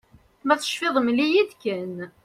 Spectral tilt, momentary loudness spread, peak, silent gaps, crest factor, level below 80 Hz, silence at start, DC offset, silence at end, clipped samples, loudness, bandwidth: -4 dB/octave; 11 LU; -6 dBFS; none; 18 dB; -66 dBFS; 0.45 s; under 0.1%; 0.15 s; under 0.1%; -23 LUFS; 15 kHz